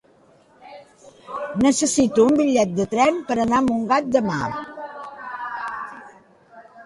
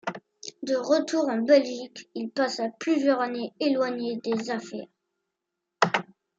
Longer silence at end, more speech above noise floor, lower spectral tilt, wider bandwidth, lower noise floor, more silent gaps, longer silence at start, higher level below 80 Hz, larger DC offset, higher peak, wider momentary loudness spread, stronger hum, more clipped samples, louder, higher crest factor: second, 0 s vs 0.35 s; second, 36 dB vs 58 dB; about the same, -4.5 dB/octave vs -4.5 dB/octave; first, 11.5 kHz vs 8 kHz; second, -55 dBFS vs -84 dBFS; neither; first, 0.65 s vs 0.05 s; first, -54 dBFS vs -80 dBFS; neither; about the same, -4 dBFS vs -4 dBFS; about the same, 18 LU vs 16 LU; neither; neither; first, -20 LUFS vs -26 LUFS; second, 18 dB vs 24 dB